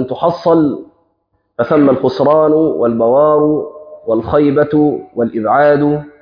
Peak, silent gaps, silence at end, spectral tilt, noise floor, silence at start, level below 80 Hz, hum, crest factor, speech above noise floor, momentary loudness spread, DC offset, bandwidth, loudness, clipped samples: 0 dBFS; none; 0.1 s; -9.5 dB/octave; -64 dBFS; 0 s; -46 dBFS; none; 12 dB; 52 dB; 9 LU; under 0.1%; 5.2 kHz; -12 LUFS; under 0.1%